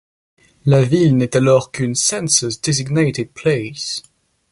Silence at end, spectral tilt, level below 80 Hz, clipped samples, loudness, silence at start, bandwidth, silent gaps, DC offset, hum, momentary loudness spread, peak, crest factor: 0.5 s; -4.5 dB/octave; -52 dBFS; under 0.1%; -16 LUFS; 0.65 s; 11.5 kHz; none; under 0.1%; none; 10 LU; 0 dBFS; 16 dB